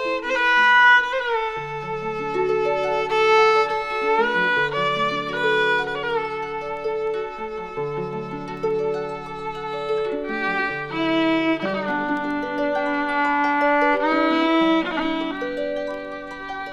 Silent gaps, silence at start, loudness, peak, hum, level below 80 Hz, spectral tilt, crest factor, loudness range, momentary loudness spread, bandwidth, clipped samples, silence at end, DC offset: none; 0 s; -21 LUFS; -6 dBFS; none; -50 dBFS; -5 dB/octave; 16 dB; 8 LU; 12 LU; 10.5 kHz; under 0.1%; 0 s; under 0.1%